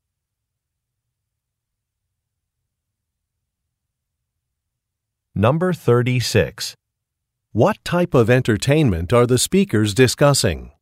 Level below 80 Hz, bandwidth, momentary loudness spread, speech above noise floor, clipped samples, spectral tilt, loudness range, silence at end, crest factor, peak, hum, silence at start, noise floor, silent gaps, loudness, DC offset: -44 dBFS; 16 kHz; 8 LU; 64 dB; under 0.1%; -5.5 dB/octave; 7 LU; 0.1 s; 18 dB; -2 dBFS; none; 5.35 s; -80 dBFS; none; -17 LUFS; under 0.1%